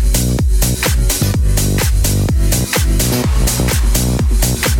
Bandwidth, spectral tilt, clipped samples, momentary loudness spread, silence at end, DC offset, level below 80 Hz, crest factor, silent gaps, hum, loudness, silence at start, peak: 18.5 kHz; -4 dB/octave; under 0.1%; 1 LU; 0 s; under 0.1%; -16 dBFS; 12 dB; none; none; -14 LUFS; 0 s; 0 dBFS